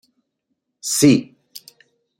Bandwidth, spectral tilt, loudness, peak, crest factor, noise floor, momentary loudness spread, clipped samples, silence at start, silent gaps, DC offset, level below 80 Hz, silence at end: 16.5 kHz; -4.5 dB/octave; -16 LUFS; -2 dBFS; 20 dB; -75 dBFS; 26 LU; under 0.1%; 0.85 s; none; under 0.1%; -58 dBFS; 0.6 s